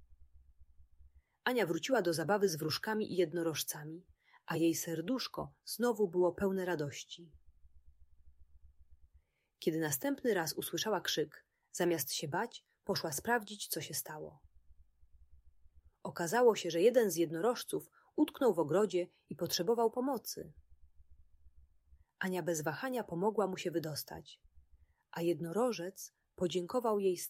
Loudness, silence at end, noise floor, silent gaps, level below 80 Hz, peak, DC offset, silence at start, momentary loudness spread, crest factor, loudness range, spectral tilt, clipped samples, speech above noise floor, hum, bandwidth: -35 LUFS; 0 s; -70 dBFS; none; -68 dBFS; -16 dBFS; under 0.1%; 0.1 s; 14 LU; 20 dB; 7 LU; -4 dB/octave; under 0.1%; 36 dB; none; 16 kHz